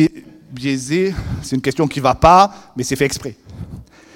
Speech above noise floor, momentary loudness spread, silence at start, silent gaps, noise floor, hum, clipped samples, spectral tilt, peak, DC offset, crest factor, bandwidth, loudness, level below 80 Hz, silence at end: 21 dB; 23 LU; 0 s; none; -37 dBFS; none; 0.2%; -5.5 dB/octave; 0 dBFS; under 0.1%; 18 dB; 17 kHz; -16 LUFS; -36 dBFS; 0.3 s